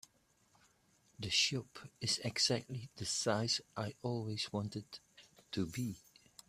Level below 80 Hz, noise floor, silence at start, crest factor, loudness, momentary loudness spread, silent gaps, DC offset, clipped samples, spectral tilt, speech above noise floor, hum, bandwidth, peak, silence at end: -72 dBFS; -73 dBFS; 1.2 s; 22 dB; -37 LUFS; 15 LU; none; under 0.1%; under 0.1%; -3 dB/octave; 35 dB; none; 15 kHz; -20 dBFS; 0.5 s